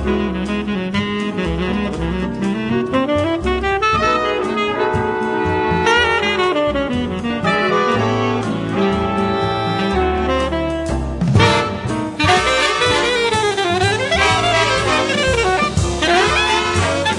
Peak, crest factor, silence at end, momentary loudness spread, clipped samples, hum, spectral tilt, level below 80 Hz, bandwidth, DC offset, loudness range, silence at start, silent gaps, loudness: -2 dBFS; 16 dB; 0 s; 7 LU; under 0.1%; none; -4.5 dB/octave; -32 dBFS; 11.5 kHz; under 0.1%; 3 LU; 0 s; none; -17 LUFS